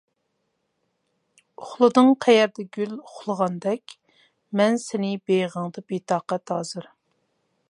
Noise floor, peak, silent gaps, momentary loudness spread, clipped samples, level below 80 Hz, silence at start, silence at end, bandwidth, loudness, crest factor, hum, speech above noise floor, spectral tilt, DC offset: -75 dBFS; -2 dBFS; none; 15 LU; under 0.1%; -76 dBFS; 1.6 s; 0.9 s; 11.5 kHz; -23 LUFS; 22 dB; none; 52 dB; -5.5 dB/octave; under 0.1%